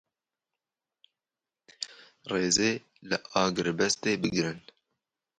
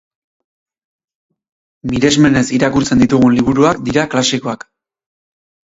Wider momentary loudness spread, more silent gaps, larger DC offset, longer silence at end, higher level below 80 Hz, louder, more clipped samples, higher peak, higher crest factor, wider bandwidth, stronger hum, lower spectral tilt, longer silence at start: first, 15 LU vs 11 LU; neither; neither; second, 0.8 s vs 1.2 s; second, -64 dBFS vs -42 dBFS; second, -28 LUFS vs -13 LUFS; neither; second, -10 dBFS vs 0 dBFS; first, 22 dB vs 16 dB; first, 11 kHz vs 8 kHz; neither; second, -3 dB/octave vs -5 dB/octave; about the same, 1.8 s vs 1.85 s